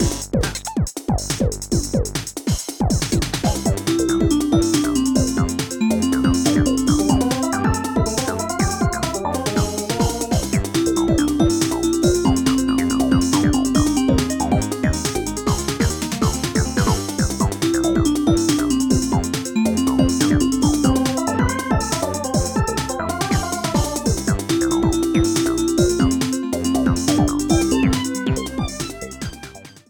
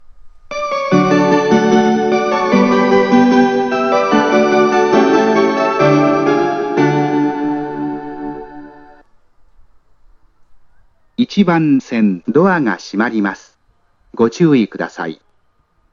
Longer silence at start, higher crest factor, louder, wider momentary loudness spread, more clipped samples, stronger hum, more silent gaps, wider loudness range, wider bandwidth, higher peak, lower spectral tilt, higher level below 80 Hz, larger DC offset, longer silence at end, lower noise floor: second, 0 s vs 0.15 s; about the same, 18 dB vs 14 dB; second, -19 LUFS vs -13 LUFS; second, 5 LU vs 12 LU; neither; neither; neither; second, 3 LU vs 11 LU; first, 20 kHz vs 7.4 kHz; about the same, -2 dBFS vs 0 dBFS; second, -5 dB/octave vs -6.5 dB/octave; first, -30 dBFS vs -52 dBFS; neither; second, 0.2 s vs 0.8 s; second, -39 dBFS vs -57 dBFS